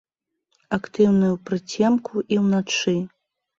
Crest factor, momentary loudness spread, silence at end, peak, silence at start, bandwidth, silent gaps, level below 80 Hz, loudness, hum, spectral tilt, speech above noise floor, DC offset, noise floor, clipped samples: 16 dB; 10 LU; 0.5 s; -6 dBFS; 0.7 s; 7.6 kHz; none; -60 dBFS; -22 LUFS; none; -5.5 dB/octave; 54 dB; under 0.1%; -75 dBFS; under 0.1%